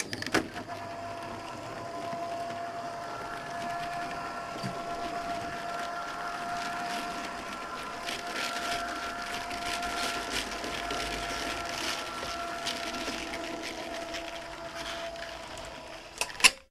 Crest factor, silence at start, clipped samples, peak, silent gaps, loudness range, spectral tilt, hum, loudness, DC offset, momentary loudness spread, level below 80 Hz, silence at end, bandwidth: 32 dB; 0 s; under 0.1%; -2 dBFS; none; 4 LU; -2 dB/octave; none; -34 LUFS; under 0.1%; 8 LU; -56 dBFS; 0.05 s; 15.5 kHz